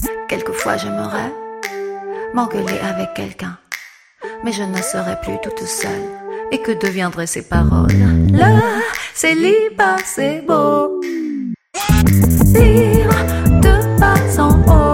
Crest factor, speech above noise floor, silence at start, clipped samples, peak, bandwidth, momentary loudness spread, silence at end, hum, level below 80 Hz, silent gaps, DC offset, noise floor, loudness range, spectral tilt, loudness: 14 dB; 22 dB; 0 s; under 0.1%; 0 dBFS; 17 kHz; 15 LU; 0 s; none; -22 dBFS; none; under 0.1%; -36 dBFS; 10 LU; -6 dB/octave; -15 LUFS